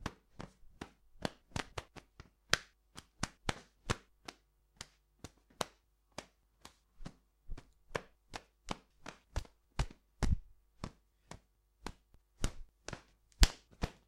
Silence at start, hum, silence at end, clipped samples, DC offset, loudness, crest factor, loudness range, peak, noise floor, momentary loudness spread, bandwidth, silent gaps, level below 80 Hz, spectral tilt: 0 s; none; 0.15 s; under 0.1%; under 0.1%; -42 LUFS; 34 dB; 9 LU; -8 dBFS; -70 dBFS; 22 LU; 16 kHz; none; -44 dBFS; -3.5 dB/octave